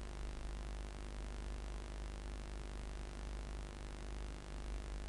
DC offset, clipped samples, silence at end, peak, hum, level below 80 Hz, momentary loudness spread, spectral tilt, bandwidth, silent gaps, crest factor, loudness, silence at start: under 0.1%; under 0.1%; 0 s; -30 dBFS; none; -46 dBFS; 1 LU; -5 dB/octave; 11.5 kHz; none; 16 dB; -49 LUFS; 0 s